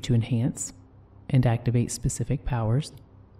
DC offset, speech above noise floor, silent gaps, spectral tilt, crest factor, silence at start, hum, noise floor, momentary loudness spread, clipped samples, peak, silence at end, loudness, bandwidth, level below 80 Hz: under 0.1%; 21 dB; none; -6 dB/octave; 16 dB; 0 s; none; -45 dBFS; 11 LU; under 0.1%; -10 dBFS; 0.4 s; -26 LUFS; 13.5 kHz; -42 dBFS